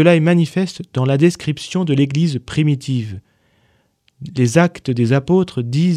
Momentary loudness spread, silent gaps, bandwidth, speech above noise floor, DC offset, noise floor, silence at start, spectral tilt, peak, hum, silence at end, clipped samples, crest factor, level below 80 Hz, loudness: 9 LU; none; 11.5 kHz; 44 dB; under 0.1%; -60 dBFS; 0 s; -7 dB/octave; 0 dBFS; none; 0 s; under 0.1%; 16 dB; -52 dBFS; -17 LUFS